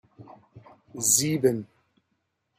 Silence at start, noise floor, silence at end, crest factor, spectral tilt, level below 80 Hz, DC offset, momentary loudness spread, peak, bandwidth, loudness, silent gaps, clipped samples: 0.2 s; -76 dBFS; 0.95 s; 22 dB; -3.5 dB/octave; -68 dBFS; under 0.1%; 15 LU; -8 dBFS; 16 kHz; -23 LUFS; none; under 0.1%